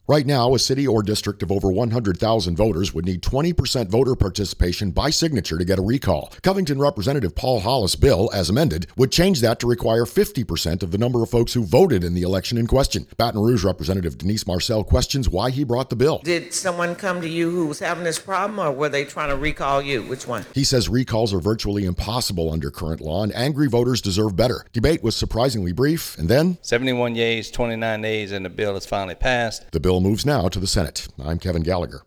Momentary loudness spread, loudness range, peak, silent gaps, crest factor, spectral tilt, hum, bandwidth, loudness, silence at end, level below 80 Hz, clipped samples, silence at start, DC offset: 6 LU; 3 LU; -4 dBFS; none; 18 dB; -5.5 dB/octave; none; 18 kHz; -21 LUFS; 0.05 s; -34 dBFS; under 0.1%; 0.1 s; under 0.1%